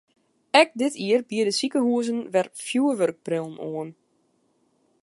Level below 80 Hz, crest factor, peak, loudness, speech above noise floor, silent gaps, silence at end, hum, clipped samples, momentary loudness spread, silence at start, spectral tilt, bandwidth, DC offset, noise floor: -76 dBFS; 22 dB; -4 dBFS; -24 LUFS; 44 dB; none; 1.1 s; none; under 0.1%; 14 LU; 0.55 s; -4 dB/octave; 11.5 kHz; under 0.1%; -68 dBFS